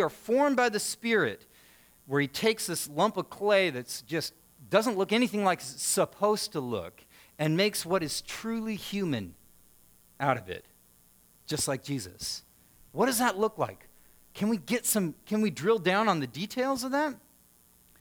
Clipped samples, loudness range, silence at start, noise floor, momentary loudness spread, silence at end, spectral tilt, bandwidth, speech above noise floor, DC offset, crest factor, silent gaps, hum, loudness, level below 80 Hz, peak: under 0.1%; 6 LU; 0 s; -61 dBFS; 10 LU; 0.85 s; -4 dB/octave; over 20 kHz; 33 dB; under 0.1%; 22 dB; none; none; -29 LUFS; -66 dBFS; -8 dBFS